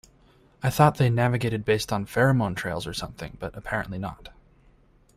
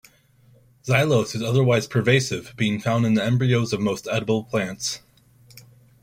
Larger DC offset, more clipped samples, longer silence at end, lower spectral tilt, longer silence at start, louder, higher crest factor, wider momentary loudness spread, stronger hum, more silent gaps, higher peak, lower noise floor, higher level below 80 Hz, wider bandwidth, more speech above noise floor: neither; neither; first, 0.85 s vs 0.4 s; about the same, -6 dB/octave vs -5.5 dB/octave; second, 0.6 s vs 0.85 s; second, -25 LUFS vs -22 LUFS; about the same, 22 dB vs 18 dB; first, 15 LU vs 8 LU; neither; neither; about the same, -4 dBFS vs -4 dBFS; about the same, -58 dBFS vs -56 dBFS; first, -50 dBFS vs -58 dBFS; about the same, 15.5 kHz vs 16 kHz; about the same, 33 dB vs 35 dB